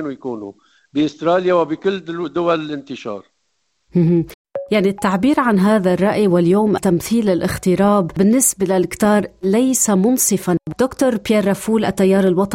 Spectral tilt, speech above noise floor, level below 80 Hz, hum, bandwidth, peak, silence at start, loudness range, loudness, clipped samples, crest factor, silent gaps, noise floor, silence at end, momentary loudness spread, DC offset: -5.5 dB/octave; 53 dB; -48 dBFS; none; 16.5 kHz; -2 dBFS; 0 s; 5 LU; -16 LUFS; under 0.1%; 14 dB; 4.34-4.45 s; -69 dBFS; 0 s; 12 LU; under 0.1%